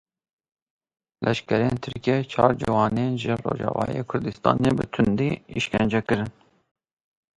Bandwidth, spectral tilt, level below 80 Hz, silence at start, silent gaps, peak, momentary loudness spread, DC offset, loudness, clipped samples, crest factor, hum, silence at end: 11.5 kHz; -7 dB/octave; -50 dBFS; 1.2 s; none; -2 dBFS; 6 LU; under 0.1%; -24 LUFS; under 0.1%; 24 dB; none; 1.1 s